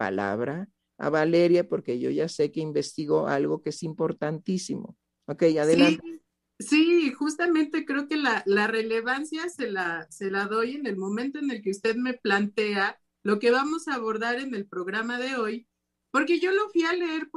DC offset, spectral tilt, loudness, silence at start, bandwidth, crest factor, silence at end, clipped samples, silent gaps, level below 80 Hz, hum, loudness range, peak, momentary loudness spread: under 0.1%; -5 dB/octave; -26 LUFS; 0 s; 12 kHz; 20 dB; 0.1 s; under 0.1%; none; -74 dBFS; none; 4 LU; -6 dBFS; 11 LU